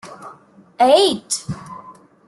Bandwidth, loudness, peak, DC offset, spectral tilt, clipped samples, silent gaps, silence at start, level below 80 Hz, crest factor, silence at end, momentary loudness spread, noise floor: 12.5 kHz; -16 LUFS; -2 dBFS; under 0.1%; -3.5 dB/octave; under 0.1%; none; 0.05 s; -56 dBFS; 18 dB; 0.35 s; 25 LU; -46 dBFS